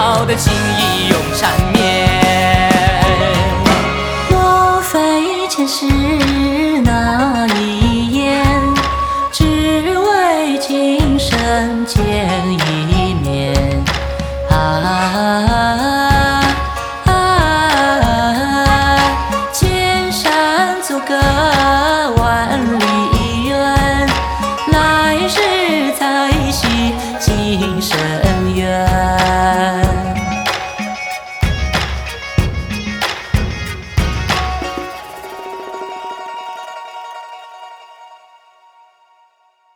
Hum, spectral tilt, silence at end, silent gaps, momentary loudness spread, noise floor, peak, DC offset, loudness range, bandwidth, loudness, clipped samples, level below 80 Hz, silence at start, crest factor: none; -5 dB/octave; 1.6 s; none; 10 LU; -55 dBFS; 0 dBFS; under 0.1%; 8 LU; over 20 kHz; -14 LUFS; under 0.1%; -24 dBFS; 0 s; 14 dB